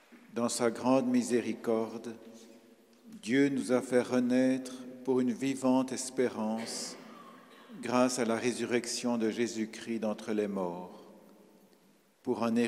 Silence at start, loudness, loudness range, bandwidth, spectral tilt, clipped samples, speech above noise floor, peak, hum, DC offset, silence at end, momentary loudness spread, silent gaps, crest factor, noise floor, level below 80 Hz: 0.1 s; -32 LUFS; 4 LU; 14.5 kHz; -4.5 dB/octave; under 0.1%; 35 dB; -12 dBFS; none; under 0.1%; 0 s; 15 LU; none; 20 dB; -65 dBFS; -80 dBFS